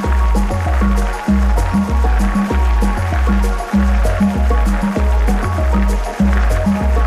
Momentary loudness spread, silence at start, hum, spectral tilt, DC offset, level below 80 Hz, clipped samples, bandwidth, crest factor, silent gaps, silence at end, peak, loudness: 2 LU; 0 s; none; -7 dB/octave; under 0.1%; -16 dBFS; under 0.1%; 13.5 kHz; 8 dB; none; 0 s; -4 dBFS; -16 LUFS